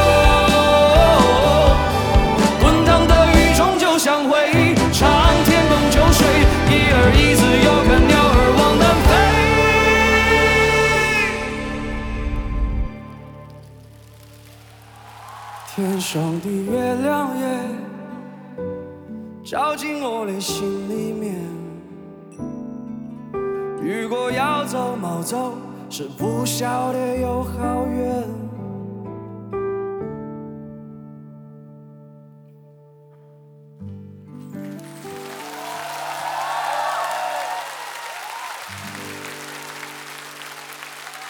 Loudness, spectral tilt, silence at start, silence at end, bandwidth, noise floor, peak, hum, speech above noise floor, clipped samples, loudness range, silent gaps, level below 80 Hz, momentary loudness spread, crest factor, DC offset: -17 LUFS; -5 dB/octave; 0 s; 0 s; over 20 kHz; -47 dBFS; 0 dBFS; none; 24 dB; under 0.1%; 18 LU; none; -26 dBFS; 21 LU; 18 dB; under 0.1%